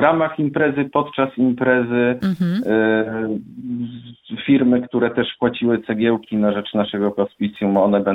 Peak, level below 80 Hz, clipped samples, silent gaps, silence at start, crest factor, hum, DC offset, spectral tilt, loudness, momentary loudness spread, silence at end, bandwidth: 0 dBFS; -56 dBFS; under 0.1%; none; 0 s; 18 dB; none; under 0.1%; -8.5 dB/octave; -19 LUFS; 11 LU; 0 s; 5.2 kHz